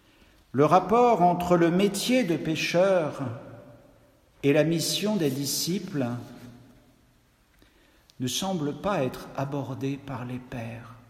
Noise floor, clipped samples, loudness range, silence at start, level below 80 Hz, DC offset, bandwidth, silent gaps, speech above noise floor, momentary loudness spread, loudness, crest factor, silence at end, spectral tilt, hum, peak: -62 dBFS; under 0.1%; 10 LU; 0.55 s; -60 dBFS; under 0.1%; 16 kHz; none; 37 dB; 15 LU; -25 LUFS; 20 dB; 0.15 s; -5 dB/octave; none; -6 dBFS